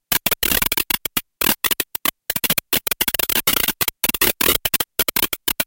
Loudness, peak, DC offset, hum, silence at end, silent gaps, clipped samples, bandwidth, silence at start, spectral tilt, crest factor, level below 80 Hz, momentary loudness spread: -18 LUFS; 0 dBFS; under 0.1%; none; 0 s; none; under 0.1%; 18 kHz; 0.1 s; -1 dB/octave; 20 dB; -42 dBFS; 5 LU